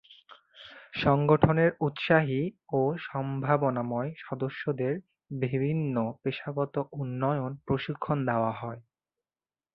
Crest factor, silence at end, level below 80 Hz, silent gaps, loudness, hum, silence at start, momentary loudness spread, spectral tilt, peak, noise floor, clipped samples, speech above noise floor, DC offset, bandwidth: 24 dB; 0.95 s; -58 dBFS; none; -29 LUFS; none; 0.1 s; 13 LU; -10 dB/octave; -6 dBFS; under -90 dBFS; under 0.1%; over 62 dB; under 0.1%; 5.6 kHz